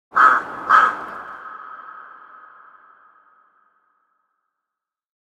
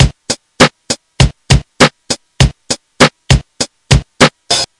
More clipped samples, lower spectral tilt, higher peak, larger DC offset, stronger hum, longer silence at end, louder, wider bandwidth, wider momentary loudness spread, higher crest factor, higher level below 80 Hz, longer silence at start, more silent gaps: second, under 0.1% vs 0.8%; second, -2.5 dB/octave vs -4 dB/octave; about the same, -2 dBFS vs 0 dBFS; neither; neither; first, 3.5 s vs 0.15 s; second, -16 LUFS vs -12 LUFS; second, 10.5 kHz vs 12 kHz; first, 25 LU vs 11 LU; first, 22 dB vs 12 dB; second, -68 dBFS vs -22 dBFS; first, 0.15 s vs 0 s; neither